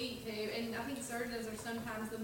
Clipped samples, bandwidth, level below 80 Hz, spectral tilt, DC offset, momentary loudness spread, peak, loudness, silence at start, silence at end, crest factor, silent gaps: under 0.1%; 17 kHz; -64 dBFS; -3.5 dB/octave; under 0.1%; 3 LU; -28 dBFS; -41 LUFS; 0 s; 0 s; 12 dB; none